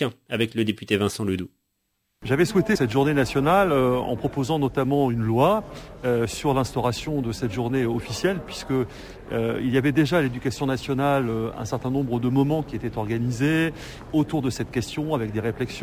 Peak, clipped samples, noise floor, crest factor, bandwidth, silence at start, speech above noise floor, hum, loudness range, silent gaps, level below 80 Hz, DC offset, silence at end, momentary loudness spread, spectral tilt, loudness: -8 dBFS; under 0.1%; -75 dBFS; 16 dB; 16 kHz; 0 s; 51 dB; none; 4 LU; none; -46 dBFS; under 0.1%; 0 s; 8 LU; -6.5 dB/octave; -24 LUFS